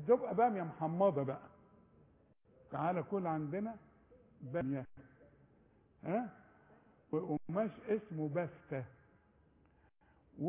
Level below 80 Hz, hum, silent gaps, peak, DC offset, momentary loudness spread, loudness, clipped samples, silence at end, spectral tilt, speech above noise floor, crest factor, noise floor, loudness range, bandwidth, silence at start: -72 dBFS; none; none; -18 dBFS; under 0.1%; 15 LU; -38 LUFS; under 0.1%; 0 s; -8.5 dB/octave; 33 dB; 22 dB; -70 dBFS; 6 LU; 3.7 kHz; 0 s